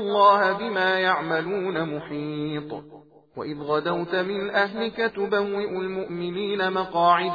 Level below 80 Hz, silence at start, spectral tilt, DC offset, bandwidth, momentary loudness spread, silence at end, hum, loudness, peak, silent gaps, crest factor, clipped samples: -64 dBFS; 0 s; -7 dB/octave; under 0.1%; 5 kHz; 12 LU; 0 s; none; -24 LUFS; -6 dBFS; none; 18 dB; under 0.1%